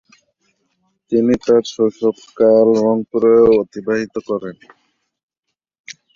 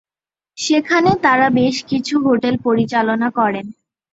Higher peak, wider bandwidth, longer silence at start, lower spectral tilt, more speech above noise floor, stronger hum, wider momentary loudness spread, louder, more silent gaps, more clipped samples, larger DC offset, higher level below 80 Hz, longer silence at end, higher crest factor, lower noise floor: about the same, -2 dBFS vs -2 dBFS; about the same, 7.4 kHz vs 8 kHz; first, 1.1 s vs 0.55 s; first, -6.5 dB/octave vs -5 dB/octave; second, 64 dB vs over 74 dB; neither; first, 12 LU vs 7 LU; about the same, -15 LUFS vs -16 LUFS; first, 5.23-5.28 s, 5.39-5.43 s, 5.80-5.84 s vs none; neither; neither; about the same, -52 dBFS vs -54 dBFS; second, 0.25 s vs 0.4 s; about the same, 16 dB vs 16 dB; second, -78 dBFS vs under -90 dBFS